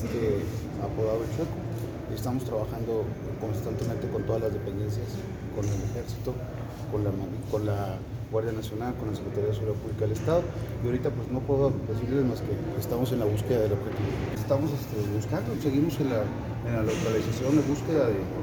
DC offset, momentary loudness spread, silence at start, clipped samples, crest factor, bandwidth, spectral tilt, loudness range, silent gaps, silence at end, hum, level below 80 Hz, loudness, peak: under 0.1%; 8 LU; 0 s; under 0.1%; 16 dB; over 20 kHz; -7.5 dB/octave; 4 LU; none; 0 s; none; -46 dBFS; -29 LUFS; -12 dBFS